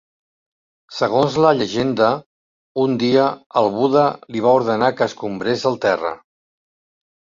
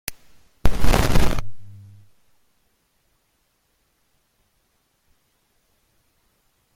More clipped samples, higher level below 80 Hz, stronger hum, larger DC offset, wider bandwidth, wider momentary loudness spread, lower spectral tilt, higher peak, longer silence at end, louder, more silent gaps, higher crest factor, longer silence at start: neither; second, -58 dBFS vs -30 dBFS; neither; neither; second, 7.6 kHz vs 16 kHz; second, 8 LU vs 26 LU; about the same, -6 dB/octave vs -5 dB/octave; about the same, -2 dBFS vs -2 dBFS; second, 1.15 s vs 5.05 s; first, -18 LUFS vs -23 LUFS; first, 2.26-2.75 s, 3.46-3.50 s vs none; about the same, 18 dB vs 20 dB; first, 0.9 s vs 0.1 s